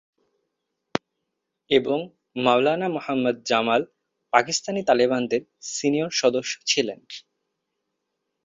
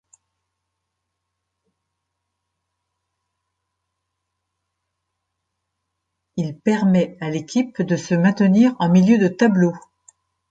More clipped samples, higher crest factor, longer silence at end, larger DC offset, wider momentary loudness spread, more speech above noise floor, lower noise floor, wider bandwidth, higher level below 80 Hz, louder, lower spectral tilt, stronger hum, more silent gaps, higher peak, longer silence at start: neither; first, 24 dB vs 18 dB; first, 1.25 s vs 0.7 s; neither; about the same, 11 LU vs 12 LU; second, 58 dB vs 62 dB; about the same, -80 dBFS vs -79 dBFS; about the same, 7.8 kHz vs 7.8 kHz; about the same, -66 dBFS vs -64 dBFS; second, -23 LUFS vs -18 LUFS; second, -3.5 dB/octave vs -7.5 dB/octave; neither; neither; about the same, -2 dBFS vs -4 dBFS; second, 0.95 s vs 6.35 s